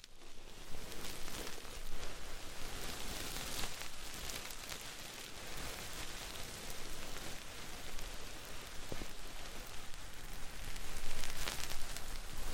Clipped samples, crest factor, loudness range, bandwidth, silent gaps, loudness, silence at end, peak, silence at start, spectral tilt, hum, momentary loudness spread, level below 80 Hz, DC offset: under 0.1%; 20 dB; 4 LU; 17 kHz; none; -46 LUFS; 0 s; -18 dBFS; 0.05 s; -2 dB/octave; none; 8 LU; -46 dBFS; under 0.1%